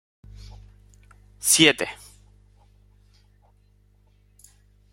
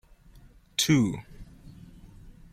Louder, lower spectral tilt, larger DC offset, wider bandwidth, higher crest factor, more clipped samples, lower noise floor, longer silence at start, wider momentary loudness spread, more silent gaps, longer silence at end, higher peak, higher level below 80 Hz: first, -19 LUFS vs -25 LUFS; second, -1.5 dB/octave vs -4 dB/octave; neither; about the same, 16.5 kHz vs 16.5 kHz; first, 28 dB vs 20 dB; neither; first, -59 dBFS vs -54 dBFS; first, 1.45 s vs 0.8 s; first, 30 LU vs 27 LU; neither; first, 3 s vs 0.2 s; first, -2 dBFS vs -10 dBFS; about the same, -54 dBFS vs -52 dBFS